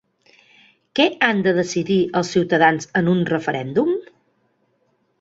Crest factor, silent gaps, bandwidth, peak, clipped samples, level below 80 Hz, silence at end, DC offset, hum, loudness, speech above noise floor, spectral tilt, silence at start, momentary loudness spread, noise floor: 20 dB; none; 8 kHz; 0 dBFS; under 0.1%; -60 dBFS; 1.2 s; under 0.1%; none; -19 LUFS; 47 dB; -5.5 dB/octave; 0.95 s; 6 LU; -66 dBFS